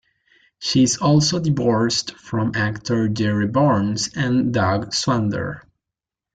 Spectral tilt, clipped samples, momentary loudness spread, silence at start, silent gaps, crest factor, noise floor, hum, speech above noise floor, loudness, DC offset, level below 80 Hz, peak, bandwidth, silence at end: -5 dB/octave; under 0.1%; 8 LU; 0.6 s; none; 16 dB; -87 dBFS; none; 67 dB; -20 LUFS; under 0.1%; -52 dBFS; -4 dBFS; 9.4 kHz; 0.75 s